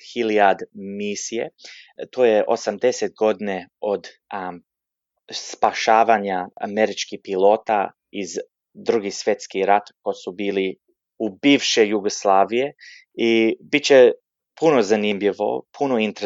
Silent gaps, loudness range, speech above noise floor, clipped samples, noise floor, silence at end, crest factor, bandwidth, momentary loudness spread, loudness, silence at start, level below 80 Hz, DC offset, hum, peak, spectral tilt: none; 6 LU; 61 dB; under 0.1%; -81 dBFS; 0 s; 18 dB; 7.8 kHz; 15 LU; -20 LUFS; 0.05 s; -70 dBFS; under 0.1%; none; -2 dBFS; -3.5 dB/octave